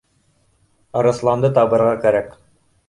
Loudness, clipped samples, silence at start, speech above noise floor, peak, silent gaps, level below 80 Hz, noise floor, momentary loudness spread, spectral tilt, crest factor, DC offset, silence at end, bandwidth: -17 LUFS; under 0.1%; 0.95 s; 45 dB; -2 dBFS; none; -54 dBFS; -61 dBFS; 9 LU; -7.5 dB/octave; 16 dB; under 0.1%; 0.6 s; 11 kHz